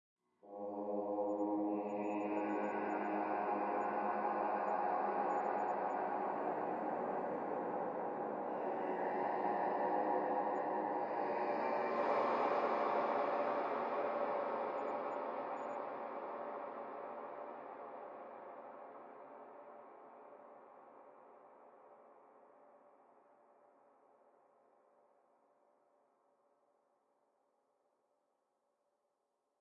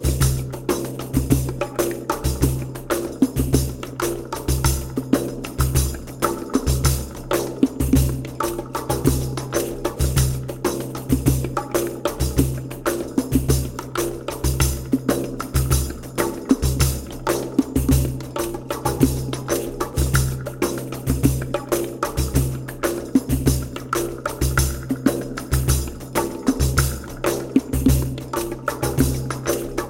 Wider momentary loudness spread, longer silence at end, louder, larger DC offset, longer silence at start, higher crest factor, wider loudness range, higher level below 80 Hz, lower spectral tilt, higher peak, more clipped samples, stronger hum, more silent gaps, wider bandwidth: first, 19 LU vs 6 LU; first, 6.85 s vs 0 s; second, -39 LUFS vs -22 LUFS; neither; first, 0.45 s vs 0 s; about the same, 18 dB vs 20 dB; first, 17 LU vs 1 LU; second, under -90 dBFS vs -28 dBFS; first, -7.5 dB/octave vs -5.5 dB/octave; second, -24 dBFS vs -2 dBFS; neither; neither; neither; second, 7.4 kHz vs 17 kHz